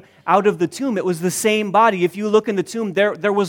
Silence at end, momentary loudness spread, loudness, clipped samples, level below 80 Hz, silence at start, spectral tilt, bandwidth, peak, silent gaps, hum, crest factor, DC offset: 0 s; 7 LU; -18 LUFS; under 0.1%; -68 dBFS; 0.25 s; -4.5 dB/octave; 18.5 kHz; -2 dBFS; none; none; 16 dB; under 0.1%